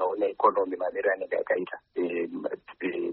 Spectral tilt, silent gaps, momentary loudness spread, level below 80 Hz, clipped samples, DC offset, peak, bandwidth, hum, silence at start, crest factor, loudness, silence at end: -3.5 dB/octave; none; 10 LU; -74 dBFS; under 0.1%; under 0.1%; -10 dBFS; 4.3 kHz; none; 0 s; 20 dB; -29 LUFS; 0 s